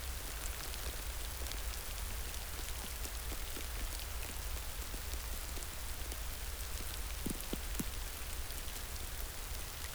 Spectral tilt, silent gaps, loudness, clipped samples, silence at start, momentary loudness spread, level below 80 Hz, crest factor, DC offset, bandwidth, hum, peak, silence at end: -2.5 dB/octave; none; -42 LUFS; under 0.1%; 0 s; 2 LU; -44 dBFS; 20 dB; under 0.1%; over 20 kHz; none; -20 dBFS; 0 s